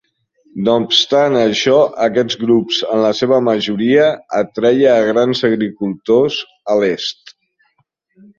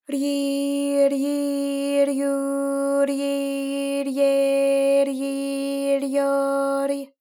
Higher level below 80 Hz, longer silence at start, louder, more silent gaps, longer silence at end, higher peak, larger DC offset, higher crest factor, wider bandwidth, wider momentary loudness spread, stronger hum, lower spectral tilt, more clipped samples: first, -58 dBFS vs under -90 dBFS; first, 0.55 s vs 0.1 s; first, -14 LUFS vs -22 LUFS; neither; first, 1.05 s vs 0.15 s; first, 0 dBFS vs -10 dBFS; neither; about the same, 14 dB vs 12 dB; second, 7.4 kHz vs 17 kHz; about the same, 8 LU vs 6 LU; neither; first, -5 dB/octave vs -2.5 dB/octave; neither